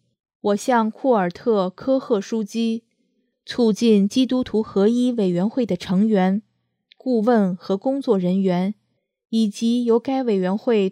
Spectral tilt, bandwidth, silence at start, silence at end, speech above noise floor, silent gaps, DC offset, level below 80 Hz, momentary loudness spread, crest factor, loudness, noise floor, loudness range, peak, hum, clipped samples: -7 dB/octave; 14 kHz; 0.45 s; 0 s; 50 dB; none; under 0.1%; -62 dBFS; 7 LU; 16 dB; -21 LUFS; -69 dBFS; 2 LU; -4 dBFS; none; under 0.1%